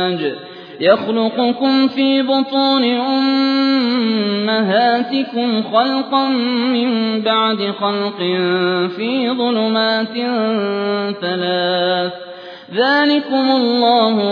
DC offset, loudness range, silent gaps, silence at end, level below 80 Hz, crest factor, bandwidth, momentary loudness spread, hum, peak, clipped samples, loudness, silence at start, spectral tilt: under 0.1%; 2 LU; none; 0 s; -70 dBFS; 16 dB; 5.2 kHz; 6 LU; none; 0 dBFS; under 0.1%; -16 LUFS; 0 s; -7 dB/octave